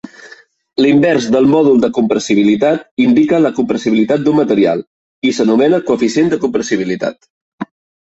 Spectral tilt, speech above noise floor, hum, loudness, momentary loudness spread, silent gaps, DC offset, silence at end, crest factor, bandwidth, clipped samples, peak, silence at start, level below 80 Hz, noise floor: -6 dB/octave; 29 dB; none; -13 LUFS; 11 LU; 2.91-2.97 s, 4.87-5.22 s, 7.30-7.58 s; under 0.1%; 0.45 s; 12 dB; 8 kHz; under 0.1%; -2 dBFS; 0.05 s; -54 dBFS; -41 dBFS